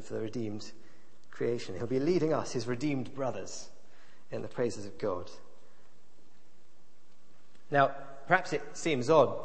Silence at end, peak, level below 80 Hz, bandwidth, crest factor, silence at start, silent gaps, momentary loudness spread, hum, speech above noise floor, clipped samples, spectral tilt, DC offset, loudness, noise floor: 0 s; -8 dBFS; -68 dBFS; 8.8 kHz; 26 dB; 0 s; none; 15 LU; none; 35 dB; under 0.1%; -5.5 dB/octave; 1%; -32 LUFS; -67 dBFS